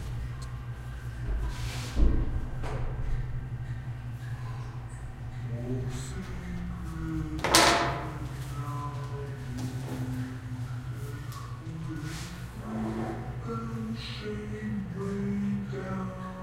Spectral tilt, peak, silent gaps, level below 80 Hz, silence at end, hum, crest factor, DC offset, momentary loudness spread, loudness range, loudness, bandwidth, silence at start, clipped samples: -4.5 dB/octave; 0 dBFS; none; -38 dBFS; 0 s; none; 32 dB; under 0.1%; 10 LU; 9 LU; -33 LUFS; 16 kHz; 0 s; under 0.1%